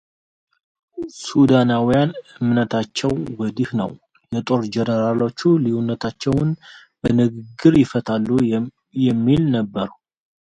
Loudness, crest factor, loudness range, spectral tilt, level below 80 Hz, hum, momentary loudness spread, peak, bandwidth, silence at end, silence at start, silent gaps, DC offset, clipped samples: -19 LUFS; 18 dB; 3 LU; -7 dB/octave; -48 dBFS; none; 12 LU; 0 dBFS; 9.2 kHz; 0.5 s; 0.95 s; none; under 0.1%; under 0.1%